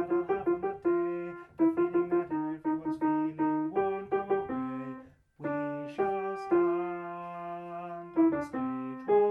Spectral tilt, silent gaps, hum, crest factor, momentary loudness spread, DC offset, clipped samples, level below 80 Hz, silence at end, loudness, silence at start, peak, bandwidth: -9 dB/octave; none; none; 16 dB; 12 LU; under 0.1%; under 0.1%; -68 dBFS; 0 s; -31 LUFS; 0 s; -16 dBFS; 5.2 kHz